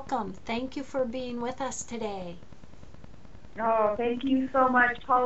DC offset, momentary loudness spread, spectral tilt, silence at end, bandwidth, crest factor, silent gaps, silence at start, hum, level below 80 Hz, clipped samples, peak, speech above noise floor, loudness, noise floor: 0.7%; 12 LU; -3 dB/octave; 0 s; 8 kHz; 20 dB; none; 0 s; none; -54 dBFS; under 0.1%; -10 dBFS; 23 dB; -28 LUFS; -51 dBFS